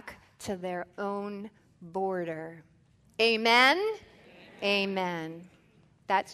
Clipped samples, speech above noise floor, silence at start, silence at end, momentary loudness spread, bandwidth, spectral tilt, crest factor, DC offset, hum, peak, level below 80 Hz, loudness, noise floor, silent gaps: under 0.1%; 33 dB; 0.05 s; 0 s; 23 LU; 13.5 kHz; -4 dB/octave; 24 dB; under 0.1%; none; -8 dBFS; -70 dBFS; -28 LUFS; -62 dBFS; none